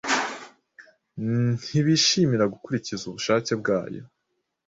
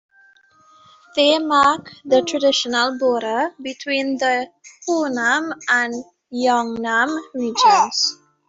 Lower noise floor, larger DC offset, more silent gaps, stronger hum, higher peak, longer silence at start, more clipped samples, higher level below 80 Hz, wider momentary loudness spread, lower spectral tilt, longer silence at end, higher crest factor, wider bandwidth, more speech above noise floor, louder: first, -77 dBFS vs -53 dBFS; neither; neither; neither; second, -8 dBFS vs -2 dBFS; second, 0.05 s vs 1.15 s; neither; about the same, -62 dBFS vs -64 dBFS; first, 16 LU vs 10 LU; first, -4.5 dB/octave vs -1.5 dB/octave; first, 0.6 s vs 0.35 s; about the same, 18 dB vs 18 dB; about the same, 8 kHz vs 8 kHz; first, 54 dB vs 35 dB; second, -24 LUFS vs -18 LUFS